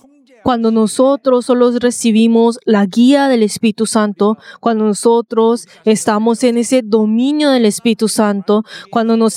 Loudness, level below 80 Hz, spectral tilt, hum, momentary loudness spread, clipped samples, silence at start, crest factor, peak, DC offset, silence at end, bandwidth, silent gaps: -13 LUFS; -58 dBFS; -5 dB/octave; none; 5 LU; under 0.1%; 0.45 s; 12 dB; 0 dBFS; under 0.1%; 0 s; 14 kHz; none